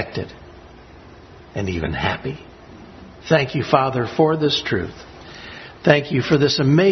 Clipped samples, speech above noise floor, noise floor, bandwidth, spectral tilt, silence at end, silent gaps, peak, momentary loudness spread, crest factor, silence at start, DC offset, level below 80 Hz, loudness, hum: under 0.1%; 24 dB; -43 dBFS; 6.4 kHz; -6 dB/octave; 0 s; none; 0 dBFS; 20 LU; 20 dB; 0 s; under 0.1%; -46 dBFS; -19 LUFS; none